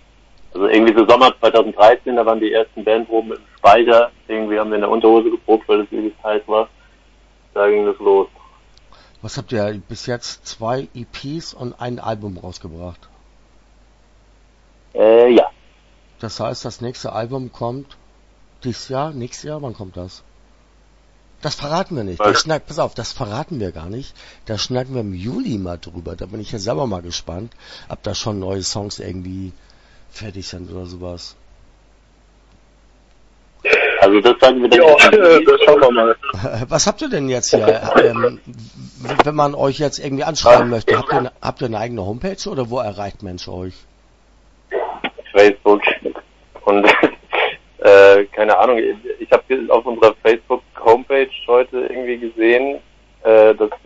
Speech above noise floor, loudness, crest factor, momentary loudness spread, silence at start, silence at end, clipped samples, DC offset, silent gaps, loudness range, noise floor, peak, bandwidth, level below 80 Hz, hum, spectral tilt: 36 dB; -15 LUFS; 16 dB; 20 LU; 0.5 s; 0.1 s; under 0.1%; under 0.1%; none; 17 LU; -51 dBFS; 0 dBFS; 8 kHz; -46 dBFS; none; -4.5 dB/octave